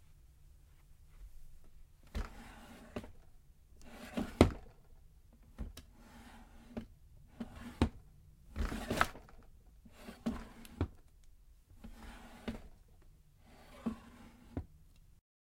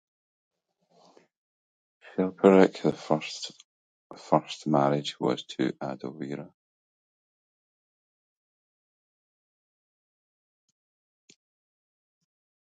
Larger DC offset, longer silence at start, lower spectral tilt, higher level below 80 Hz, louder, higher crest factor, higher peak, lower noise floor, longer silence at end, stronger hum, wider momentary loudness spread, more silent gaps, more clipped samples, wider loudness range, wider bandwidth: neither; second, 0 s vs 2.15 s; about the same, -6 dB/octave vs -6 dB/octave; first, -52 dBFS vs -74 dBFS; second, -40 LUFS vs -27 LUFS; first, 36 dB vs 26 dB; about the same, -6 dBFS vs -4 dBFS; second, -62 dBFS vs -67 dBFS; second, 0.3 s vs 6.2 s; neither; first, 26 LU vs 17 LU; second, none vs 3.64-4.10 s; neither; second, 13 LU vs 16 LU; first, 16.5 kHz vs 9.2 kHz